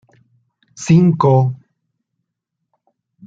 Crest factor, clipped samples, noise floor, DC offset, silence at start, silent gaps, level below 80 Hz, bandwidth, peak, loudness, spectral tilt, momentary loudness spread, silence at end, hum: 16 dB; under 0.1%; -77 dBFS; under 0.1%; 0.8 s; none; -56 dBFS; 7.8 kHz; -2 dBFS; -14 LUFS; -8 dB/octave; 17 LU; 1.7 s; none